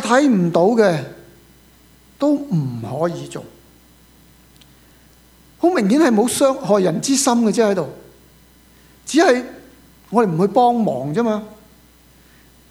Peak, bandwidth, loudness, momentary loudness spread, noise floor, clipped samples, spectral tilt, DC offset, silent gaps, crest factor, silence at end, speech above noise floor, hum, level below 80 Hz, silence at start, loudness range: 0 dBFS; over 20 kHz; -17 LUFS; 13 LU; -50 dBFS; under 0.1%; -5 dB/octave; under 0.1%; none; 18 dB; 1.15 s; 33 dB; none; -56 dBFS; 0 s; 8 LU